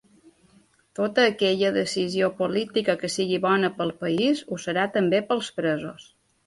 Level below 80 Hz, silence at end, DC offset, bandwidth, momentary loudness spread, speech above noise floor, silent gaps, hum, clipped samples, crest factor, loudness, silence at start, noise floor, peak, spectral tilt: -66 dBFS; 0.45 s; under 0.1%; 11.5 kHz; 7 LU; 36 dB; none; none; under 0.1%; 20 dB; -24 LUFS; 1 s; -60 dBFS; -6 dBFS; -4.5 dB/octave